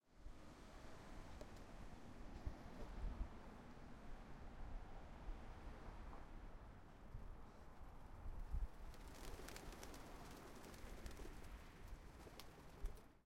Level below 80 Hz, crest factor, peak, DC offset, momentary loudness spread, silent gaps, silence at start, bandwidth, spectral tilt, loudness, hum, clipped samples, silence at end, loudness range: -56 dBFS; 20 dB; -34 dBFS; under 0.1%; 8 LU; none; 0.05 s; 16 kHz; -5 dB/octave; -58 LUFS; none; under 0.1%; 0.05 s; 3 LU